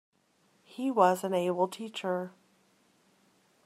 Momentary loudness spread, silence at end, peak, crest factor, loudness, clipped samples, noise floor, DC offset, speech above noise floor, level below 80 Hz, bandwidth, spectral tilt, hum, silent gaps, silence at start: 13 LU; 1.35 s; -10 dBFS; 24 dB; -30 LUFS; under 0.1%; -69 dBFS; under 0.1%; 40 dB; -86 dBFS; 15 kHz; -5.5 dB/octave; none; none; 0.8 s